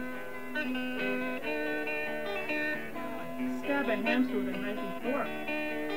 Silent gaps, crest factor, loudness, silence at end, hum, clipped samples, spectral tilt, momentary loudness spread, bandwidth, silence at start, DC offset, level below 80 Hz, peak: none; 18 dB; -33 LUFS; 0 s; none; under 0.1%; -5 dB/octave; 8 LU; 16 kHz; 0 s; 0.9%; -64 dBFS; -16 dBFS